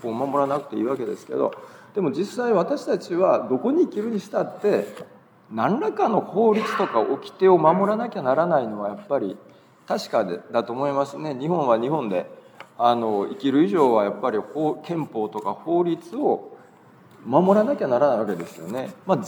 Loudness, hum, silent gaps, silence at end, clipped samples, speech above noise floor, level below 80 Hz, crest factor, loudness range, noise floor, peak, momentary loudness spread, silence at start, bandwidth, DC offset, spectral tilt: -23 LUFS; none; none; 0 s; under 0.1%; 28 dB; -82 dBFS; 20 dB; 4 LU; -51 dBFS; -4 dBFS; 10 LU; 0 s; 20 kHz; under 0.1%; -7 dB/octave